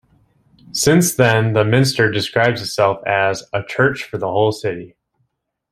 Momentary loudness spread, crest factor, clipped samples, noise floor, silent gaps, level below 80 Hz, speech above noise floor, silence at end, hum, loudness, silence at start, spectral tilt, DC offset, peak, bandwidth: 10 LU; 18 dB; under 0.1%; -70 dBFS; none; -52 dBFS; 54 dB; 0.85 s; none; -17 LUFS; 0.75 s; -4.5 dB/octave; under 0.1%; 0 dBFS; 16 kHz